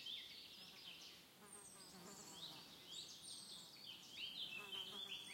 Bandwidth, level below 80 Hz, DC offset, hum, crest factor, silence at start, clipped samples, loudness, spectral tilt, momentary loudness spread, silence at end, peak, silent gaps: 16.5 kHz; -88 dBFS; under 0.1%; none; 18 dB; 0 s; under 0.1%; -53 LUFS; -0.5 dB/octave; 10 LU; 0 s; -38 dBFS; none